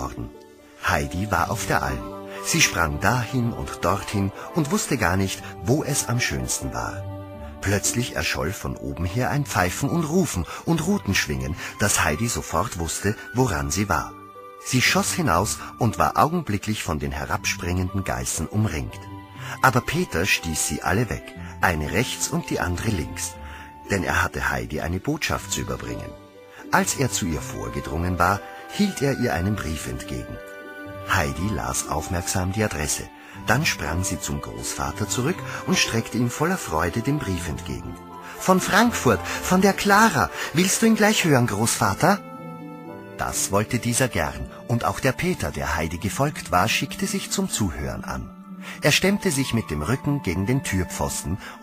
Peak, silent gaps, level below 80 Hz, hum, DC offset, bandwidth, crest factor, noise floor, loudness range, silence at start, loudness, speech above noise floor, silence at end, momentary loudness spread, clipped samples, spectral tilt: -2 dBFS; none; -40 dBFS; none; under 0.1%; 15.5 kHz; 22 dB; -46 dBFS; 5 LU; 0 s; -23 LUFS; 23 dB; 0 s; 14 LU; under 0.1%; -4 dB/octave